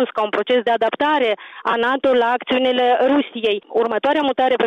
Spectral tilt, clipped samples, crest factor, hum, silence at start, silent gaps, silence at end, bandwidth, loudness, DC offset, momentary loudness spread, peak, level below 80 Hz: -5 dB/octave; under 0.1%; 10 dB; none; 0 s; none; 0 s; 7.2 kHz; -18 LUFS; under 0.1%; 5 LU; -8 dBFS; -62 dBFS